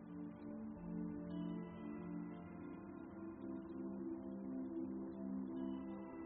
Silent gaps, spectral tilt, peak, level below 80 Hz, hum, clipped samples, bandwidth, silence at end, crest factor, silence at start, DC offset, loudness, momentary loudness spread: none; -8 dB/octave; -34 dBFS; -72 dBFS; none; under 0.1%; 3.7 kHz; 0 s; 14 dB; 0 s; under 0.1%; -48 LUFS; 6 LU